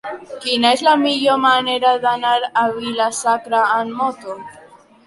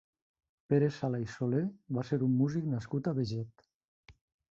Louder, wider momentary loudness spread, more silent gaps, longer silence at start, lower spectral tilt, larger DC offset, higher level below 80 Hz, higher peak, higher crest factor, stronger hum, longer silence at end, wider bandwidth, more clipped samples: first, -16 LUFS vs -33 LUFS; first, 11 LU vs 8 LU; second, none vs 3.74-4.03 s; second, 0.05 s vs 0.7 s; second, -2.5 dB/octave vs -8.5 dB/octave; neither; about the same, -64 dBFS vs -66 dBFS; first, -2 dBFS vs -16 dBFS; about the same, 16 dB vs 18 dB; neither; about the same, 0.45 s vs 0.45 s; first, 11.5 kHz vs 7.6 kHz; neither